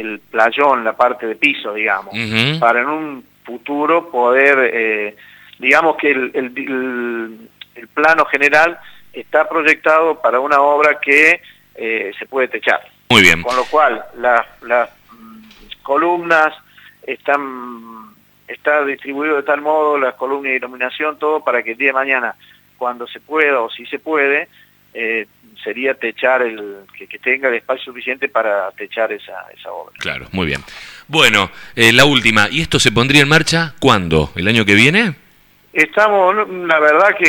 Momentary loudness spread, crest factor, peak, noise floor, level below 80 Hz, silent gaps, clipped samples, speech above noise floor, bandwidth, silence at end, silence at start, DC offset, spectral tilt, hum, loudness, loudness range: 16 LU; 16 dB; 0 dBFS; -50 dBFS; -46 dBFS; none; under 0.1%; 35 dB; over 20 kHz; 0 s; 0 s; under 0.1%; -4 dB/octave; 50 Hz at -55 dBFS; -14 LUFS; 7 LU